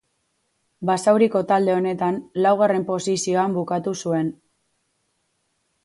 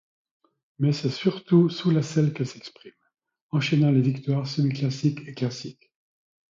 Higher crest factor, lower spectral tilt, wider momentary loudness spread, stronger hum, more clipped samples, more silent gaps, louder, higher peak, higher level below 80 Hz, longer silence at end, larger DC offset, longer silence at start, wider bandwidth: about the same, 18 dB vs 18 dB; second, -5.5 dB/octave vs -7 dB/octave; second, 7 LU vs 12 LU; neither; neither; second, none vs 3.41-3.50 s; first, -21 LUFS vs -24 LUFS; first, -4 dBFS vs -8 dBFS; about the same, -68 dBFS vs -66 dBFS; first, 1.5 s vs 0.75 s; neither; about the same, 0.8 s vs 0.8 s; first, 11.5 kHz vs 7.6 kHz